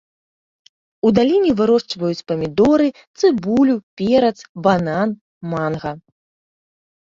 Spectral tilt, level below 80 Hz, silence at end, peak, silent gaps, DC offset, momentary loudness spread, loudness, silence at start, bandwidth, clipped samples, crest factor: -7 dB/octave; -52 dBFS; 1.1 s; -2 dBFS; 3.07-3.14 s, 3.83-3.97 s, 4.49-4.55 s, 5.21-5.41 s; under 0.1%; 9 LU; -18 LUFS; 1.05 s; 7.6 kHz; under 0.1%; 16 dB